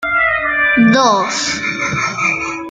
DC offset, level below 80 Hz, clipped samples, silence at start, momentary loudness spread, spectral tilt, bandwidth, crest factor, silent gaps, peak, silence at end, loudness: under 0.1%; -46 dBFS; under 0.1%; 0 s; 7 LU; -3.5 dB/octave; 9.4 kHz; 14 dB; none; -2 dBFS; 0 s; -13 LUFS